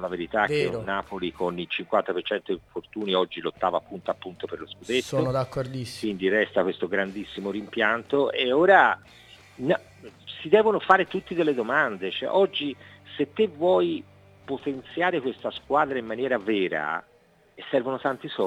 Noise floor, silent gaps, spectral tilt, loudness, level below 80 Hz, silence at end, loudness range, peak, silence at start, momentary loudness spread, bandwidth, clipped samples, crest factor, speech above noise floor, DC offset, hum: -56 dBFS; none; -5.5 dB/octave; -25 LUFS; -62 dBFS; 0 s; 6 LU; -2 dBFS; 0 s; 12 LU; 13 kHz; under 0.1%; 24 dB; 31 dB; under 0.1%; none